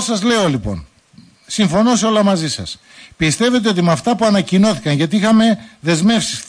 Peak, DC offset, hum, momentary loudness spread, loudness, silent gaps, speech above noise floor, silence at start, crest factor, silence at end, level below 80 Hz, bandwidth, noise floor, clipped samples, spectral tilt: -4 dBFS; under 0.1%; none; 10 LU; -15 LUFS; none; 32 dB; 0 s; 12 dB; 0.05 s; -44 dBFS; 10.5 kHz; -46 dBFS; under 0.1%; -5 dB/octave